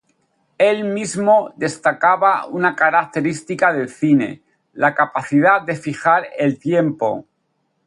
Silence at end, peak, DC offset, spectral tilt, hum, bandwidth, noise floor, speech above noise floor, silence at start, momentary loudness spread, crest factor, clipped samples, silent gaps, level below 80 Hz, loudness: 0.65 s; -2 dBFS; under 0.1%; -6 dB/octave; none; 11.5 kHz; -68 dBFS; 51 dB; 0.6 s; 8 LU; 16 dB; under 0.1%; none; -66 dBFS; -17 LUFS